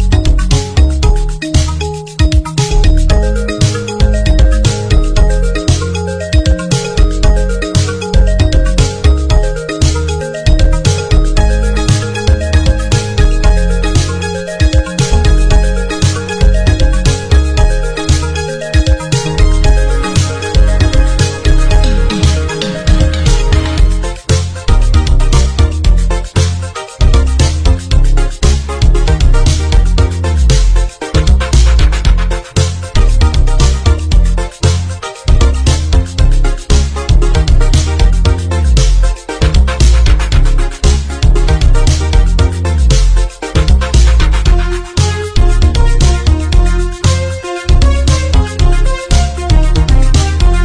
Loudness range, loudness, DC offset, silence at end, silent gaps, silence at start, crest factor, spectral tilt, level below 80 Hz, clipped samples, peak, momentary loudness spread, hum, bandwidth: 1 LU; -12 LUFS; under 0.1%; 0 s; none; 0 s; 8 dB; -5 dB/octave; -10 dBFS; under 0.1%; 0 dBFS; 4 LU; none; 10.5 kHz